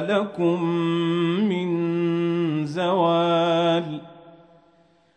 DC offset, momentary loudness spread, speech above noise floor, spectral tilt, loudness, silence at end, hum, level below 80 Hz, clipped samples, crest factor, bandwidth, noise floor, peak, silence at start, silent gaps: under 0.1%; 5 LU; 37 dB; -7.5 dB/octave; -22 LUFS; 0.8 s; none; -72 dBFS; under 0.1%; 14 dB; 8.6 kHz; -59 dBFS; -8 dBFS; 0 s; none